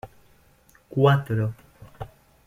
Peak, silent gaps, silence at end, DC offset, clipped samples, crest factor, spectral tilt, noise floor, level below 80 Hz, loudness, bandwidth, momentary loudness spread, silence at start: -6 dBFS; none; 0.4 s; under 0.1%; under 0.1%; 20 dB; -8 dB/octave; -58 dBFS; -54 dBFS; -23 LUFS; 13.5 kHz; 22 LU; 0.05 s